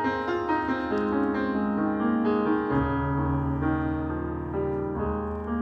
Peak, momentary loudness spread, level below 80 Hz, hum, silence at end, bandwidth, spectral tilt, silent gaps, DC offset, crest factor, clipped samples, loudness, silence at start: -12 dBFS; 5 LU; -40 dBFS; none; 0 s; 6.6 kHz; -9.5 dB/octave; none; under 0.1%; 14 dB; under 0.1%; -27 LUFS; 0 s